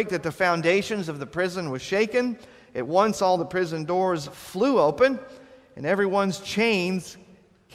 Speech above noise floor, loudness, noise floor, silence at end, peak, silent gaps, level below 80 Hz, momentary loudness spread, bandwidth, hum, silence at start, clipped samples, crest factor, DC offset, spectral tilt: 30 dB; -24 LUFS; -54 dBFS; 0.55 s; -6 dBFS; none; -60 dBFS; 11 LU; 15.5 kHz; none; 0 s; under 0.1%; 20 dB; under 0.1%; -5 dB/octave